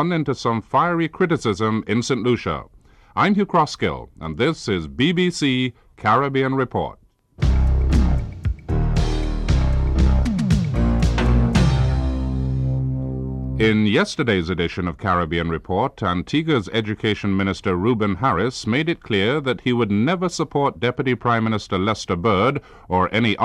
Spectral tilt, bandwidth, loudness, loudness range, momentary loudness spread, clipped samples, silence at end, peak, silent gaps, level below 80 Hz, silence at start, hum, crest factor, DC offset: -6.5 dB/octave; 10.5 kHz; -21 LUFS; 2 LU; 6 LU; under 0.1%; 0 s; -4 dBFS; none; -26 dBFS; 0 s; none; 14 dB; under 0.1%